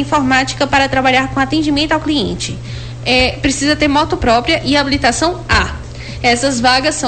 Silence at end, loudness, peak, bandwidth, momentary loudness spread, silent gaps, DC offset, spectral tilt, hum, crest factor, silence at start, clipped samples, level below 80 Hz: 0 s; -13 LUFS; -2 dBFS; 9.2 kHz; 10 LU; none; 0.6%; -4 dB/octave; none; 12 dB; 0 s; under 0.1%; -30 dBFS